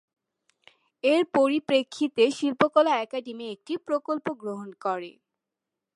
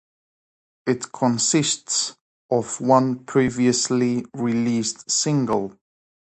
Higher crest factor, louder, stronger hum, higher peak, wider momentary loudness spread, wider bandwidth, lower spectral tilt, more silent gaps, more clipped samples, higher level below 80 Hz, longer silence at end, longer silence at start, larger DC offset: about the same, 22 dB vs 20 dB; second, -26 LUFS vs -21 LUFS; neither; about the same, -4 dBFS vs -2 dBFS; first, 13 LU vs 7 LU; first, 11.5 kHz vs 9 kHz; about the same, -4.5 dB/octave vs -4 dB/octave; second, none vs 2.21-2.49 s; neither; second, -76 dBFS vs -60 dBFS; first, 0.85 s vs 0.65 s; first, 1.05 s vs 0.85 s; neither